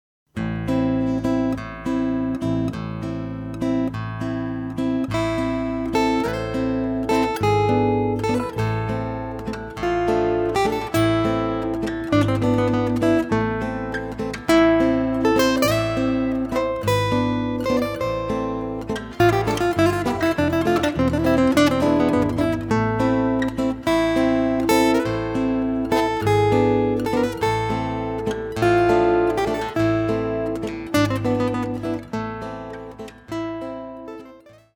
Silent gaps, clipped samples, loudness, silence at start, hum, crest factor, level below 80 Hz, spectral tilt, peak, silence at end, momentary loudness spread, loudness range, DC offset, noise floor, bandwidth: none; under 0.1%; -21 LUFS; 0.35 s; none; 18 dB; -40 dBFS; -6.5 dB/octave; -4 dBFS; 0.4 s; 10 LU; 5 LU; under 0.1%; -46 dBFS; over 20 kHz